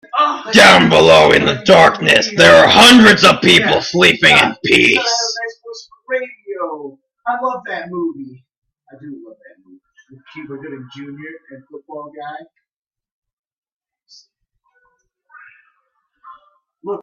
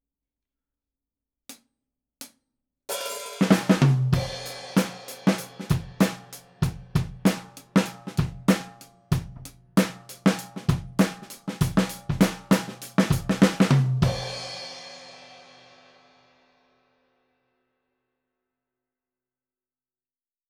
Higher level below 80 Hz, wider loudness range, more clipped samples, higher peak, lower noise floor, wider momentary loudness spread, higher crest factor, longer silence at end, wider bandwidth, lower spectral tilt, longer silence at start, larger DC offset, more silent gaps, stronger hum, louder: about the same, -48 dBFS vs -46 dBFS; first, 26 LU vs 7 LU; first, 0.1% vs under 0.1%; first, 0 dBFS vs -4 dBFS; second, -67 dBFS vs under -90 dBFS; first, 25 LU vs 20 LU; second, 14 dB vs 22 dB; second, 0 s vs 5.25 s; second, 16 kHz vs 19 kHz; second, -3.5 dB/octave vs -6 dB/octave; second, 0.15 s vs 1.5 s; neither; first, 8.58-8.62 s, 12.73-12.85 s, 13.12-13.22 s, 13.33-13.51 s, 13.57-13.62 s, 13.72-13.80 s vs none; neither; first, -9 LUFS vs -25 LUFS